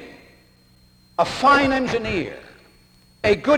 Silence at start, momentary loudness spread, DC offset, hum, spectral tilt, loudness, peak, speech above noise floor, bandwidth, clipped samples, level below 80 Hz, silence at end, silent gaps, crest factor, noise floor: 0 s; 16 LU; under 0.1%; none; -5 dB/octave; -20 LUFS; -6 dBFS; 36 dB; 14 kHz; under 0.1%; -48 dBFS; 0 s; none; 16 dB; -54 dBFS